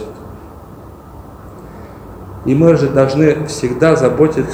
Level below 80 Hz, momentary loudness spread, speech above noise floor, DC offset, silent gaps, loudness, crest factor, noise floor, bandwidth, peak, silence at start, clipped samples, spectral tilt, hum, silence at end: -40 dBFS; 25 LU; 23 dB; under 0.1%; none; -13 LUFS; 16 dB; -35 dBFS; 16 kHz; 0 dBFS; 0 s; under 0.1%; -7 dB/octave; none; 0 s